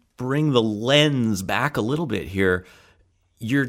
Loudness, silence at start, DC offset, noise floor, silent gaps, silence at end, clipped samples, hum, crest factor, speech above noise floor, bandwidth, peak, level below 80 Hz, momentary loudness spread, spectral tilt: -21 LUFS; 0.2 s; under 0.1%; -61 dBFS; none; 0 s; under 0.1%; none; 18 dB; 40 dB; 16 kHz; -4 dBFS; -52 dBFS; 9 LU; -5.5 dB/octave